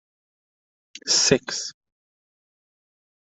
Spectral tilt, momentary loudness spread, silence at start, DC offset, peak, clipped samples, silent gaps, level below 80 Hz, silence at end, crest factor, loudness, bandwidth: -2 dB/octave; 17 LU; 0.95 s; under 0.1%; -2 dBFS; under 0.1%; none; -60 dBFS; 1.55 s; 26 dB; -20 LUFS; 8.4 kHz